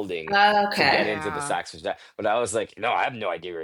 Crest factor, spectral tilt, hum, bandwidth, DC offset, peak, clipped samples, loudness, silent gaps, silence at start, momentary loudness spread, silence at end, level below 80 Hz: 20 dB; -3 dB/octave; none; 19 kHz; under 0.1%; -6 dBFS; under 0.1%; -23 LUFS; none; 0 s; 11 LU; 0 s; -62 dBFS